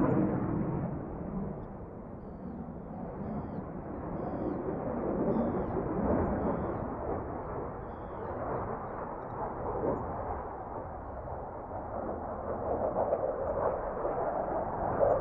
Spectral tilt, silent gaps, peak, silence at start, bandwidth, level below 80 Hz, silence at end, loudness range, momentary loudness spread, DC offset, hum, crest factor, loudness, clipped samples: -10.5 dB/octave; none; -14 dBFS; 0 s; 3.7 kHz; -48 dBFS; 0 s; 6 LU; 11 LU; under 0.1%; none; 20 dB; -35 LUFS; under 0.1%